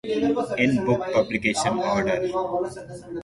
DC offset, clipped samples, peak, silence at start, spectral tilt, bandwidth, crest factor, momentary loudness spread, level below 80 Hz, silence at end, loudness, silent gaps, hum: under 0.1%; under 0.1%; -8 dBFS; 0.05 s; -5 dB/octave; 11.5 kHz; 16 dB; 8 LU; -52 dBFS; 0 s; -23 LUFS; none; none